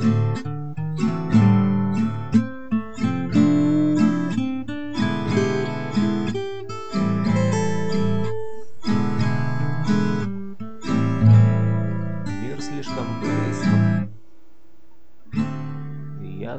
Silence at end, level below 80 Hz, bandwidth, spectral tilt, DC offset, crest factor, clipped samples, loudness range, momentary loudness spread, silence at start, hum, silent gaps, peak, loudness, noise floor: 0 s; -50 dBFS; 8.4 kHz; -7.5 dB/octave; 2%; 18 dB; under 0.1%; 5 LU; 13 LU; 0 s; none; none; -4 dBFS; -22 LUFS; -57 dBFS